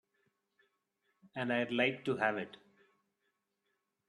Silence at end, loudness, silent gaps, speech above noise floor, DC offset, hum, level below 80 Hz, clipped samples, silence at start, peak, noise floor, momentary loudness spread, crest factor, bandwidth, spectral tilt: 1.6 s; -34 LUFS; none; 49 dB; under 0.1%; none; -82 dBFS; under 0.1%; 1.35 s; -16 dBFS; -84 dBFS; 14 LU; 22 dB; 10.5 kHz; -6 dB/octave